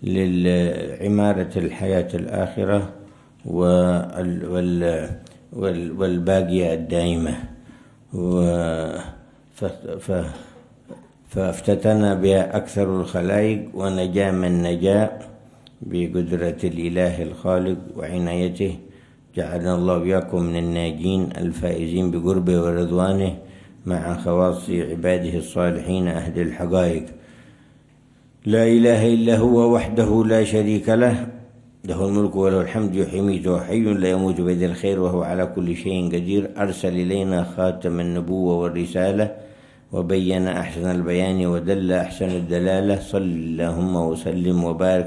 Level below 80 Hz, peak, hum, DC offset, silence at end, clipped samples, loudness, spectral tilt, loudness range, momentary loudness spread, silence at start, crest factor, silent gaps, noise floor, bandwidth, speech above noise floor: -48 dBFS; -4 dBFS; none; under 0.1%; 0 s; under 0.1%; -21 LUFS; -7.5 dB/octave; 5 LU; 10 LU; 0 s; 16 dB; none; -53 dBFS; 12 kHz; 32 dB